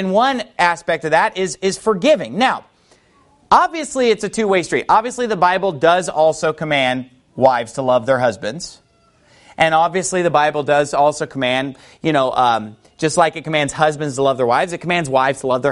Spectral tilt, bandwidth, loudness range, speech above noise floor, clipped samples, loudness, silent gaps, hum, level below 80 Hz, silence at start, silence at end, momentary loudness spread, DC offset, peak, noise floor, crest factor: -4 dB/octave; 11.5 kHz; 2 LU; 38 dB; under 0.1%; -17 LUFS; none; none; -54 dBFS; 0 s; 0 s; 6 LU; under 0.1%; 0 dBFS; -54 dBFS; 16 dB